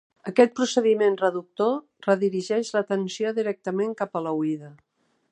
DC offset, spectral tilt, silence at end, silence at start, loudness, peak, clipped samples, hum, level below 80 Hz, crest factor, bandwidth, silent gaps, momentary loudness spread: under 0.1%; -5 dB/octave; 0.6 s; 0.25 s; -24 LUFS; -4 dBFS; under 0.1%; none; -80 dBFS; 22 dB; 10 kHz; none; 7 LU